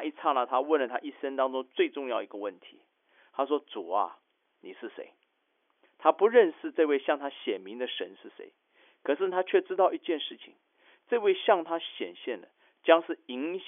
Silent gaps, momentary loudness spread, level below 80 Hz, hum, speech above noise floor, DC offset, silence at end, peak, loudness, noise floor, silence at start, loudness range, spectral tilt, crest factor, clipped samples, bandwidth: none; 17 LU; under -90 dBFS; none; 46 dB; under 0.1%; 0 s; -6 dBFS; -29 LUFS; -75 dBFS; 0 s; 7 LU; 2 dB/octave; 24 dB; under 0.1%; 3.7 kHz